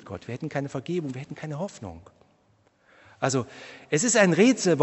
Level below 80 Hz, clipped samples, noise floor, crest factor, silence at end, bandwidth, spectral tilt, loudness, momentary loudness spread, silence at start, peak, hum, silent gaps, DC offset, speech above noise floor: -64 dBFS; under 0.1%; -64 dBFS; 22 dB; 0 s; 8.4 kHz; -4.5 dB/octave; -25 LUFS; 19 LU; 0.05 s; -4 dBFS; none; none; under 0.1%; 39 dB